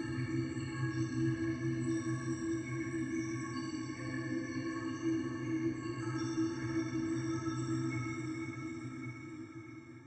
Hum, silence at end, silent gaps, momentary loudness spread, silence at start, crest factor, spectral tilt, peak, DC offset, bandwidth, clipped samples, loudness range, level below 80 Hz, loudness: none; 0 s; none; 8 LU; 0 s; 14 dB; -6.5 dB/octave; -24 dBFS; under 0.1%; 8.8 kHz; under 0.1%; 2 LU; -64 dBFS; -38 LUFS